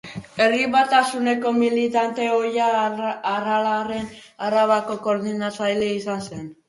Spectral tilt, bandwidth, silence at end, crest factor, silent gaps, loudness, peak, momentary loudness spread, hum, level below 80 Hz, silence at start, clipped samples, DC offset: -4.5 dB/octave; 11.5 kHz; 0.15 s; 18 dB; none; -21 LUFS; -4 dBFS; 10 LU; none; -62 dBFS; 0.05 s; under 0.1%; under 0.1%